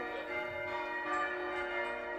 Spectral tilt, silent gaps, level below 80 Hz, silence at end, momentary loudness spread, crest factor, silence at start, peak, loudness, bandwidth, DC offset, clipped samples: -4.5 dB/octave; none; -66 dBFS; 0 s; 3 LU; 14 dB; 0 s; -24 dBFS; -37 LUFS; 14.5 kHz; under 0.1%; under 0.1%